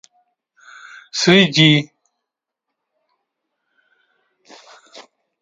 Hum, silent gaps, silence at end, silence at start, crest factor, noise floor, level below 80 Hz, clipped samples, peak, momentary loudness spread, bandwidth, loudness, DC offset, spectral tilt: none; none; 0.4 s; 1.15 s; 22 dB; -82 dBFS; -62 dBFS; under 0.1%; 0 dBFS; 24 LU; 9.2 kHz; -13 LUFS; under 0.1%; -4.5 dB/octave